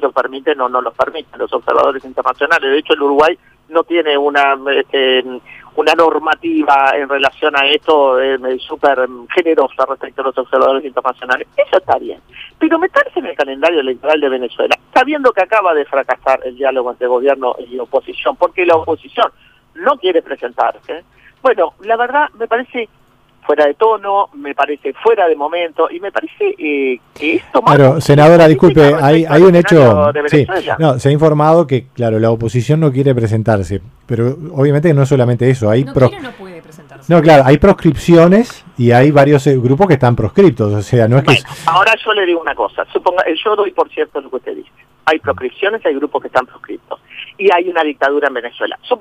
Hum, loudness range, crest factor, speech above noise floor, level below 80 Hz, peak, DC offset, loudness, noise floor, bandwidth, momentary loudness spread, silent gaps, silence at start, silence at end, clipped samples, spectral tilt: none; 7 LU; 12 dB; 23 dB; -42 dBFS; 0 dBFS; under 0.1%; -12 LUFS; -35 dBFS; 14.5 kHz; 12 LU; none; 0 s; 0 s; under 0.1%; -7 dB/octave